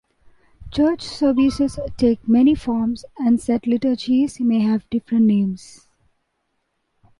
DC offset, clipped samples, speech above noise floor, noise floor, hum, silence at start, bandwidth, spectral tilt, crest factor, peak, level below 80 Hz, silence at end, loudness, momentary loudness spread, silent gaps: under 0.1%; under 0.1%; 53 dB; -72 dBFS; none; 0.6 s; 11.5 kHz; -7 dB/octave; 14 dB; -6 dBFS; -46 dBFS; 1.65 s; -19 LUFS; 7 LU; none